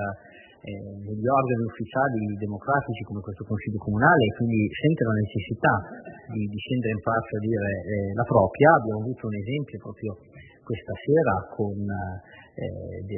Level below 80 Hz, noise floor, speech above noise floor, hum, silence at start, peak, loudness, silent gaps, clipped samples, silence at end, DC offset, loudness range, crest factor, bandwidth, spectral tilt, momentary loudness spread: -56 dBFS; -49 dBFS; 24 dB; none; 0 s; -4 dBFS; -25 LUFS; none; under 0.1%; 0 s; under 0.1%; 5 LU; 22 dB; 3.2 kHz; -11.5 dB/octave; 16 LU